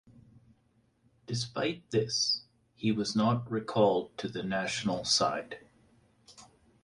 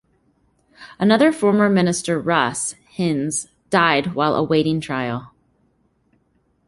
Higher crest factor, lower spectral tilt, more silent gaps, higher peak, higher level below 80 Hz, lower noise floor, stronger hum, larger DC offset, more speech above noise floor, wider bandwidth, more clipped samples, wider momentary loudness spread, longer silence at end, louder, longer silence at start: about the same, 20 dB vs 18 dB; about the same, -4 dB/octave vs -4.5 dB/octave; neither; second, -12 dBFS vs -2 dBFS; second, -66 dBFS vs -56 dBFS; first, -70 dBFS vs -64 dBFS; neither; neither; second, 39 dB vs 46 dB; about the same, 11.5 kHz vs 11.5 kHz; neither; about the same, 11 LU vs 10 LU; second, 0.4 s vs 1.4 s; second, -30 LUFS vs -19 LUFS; first, 1.3 s vs 0.8 s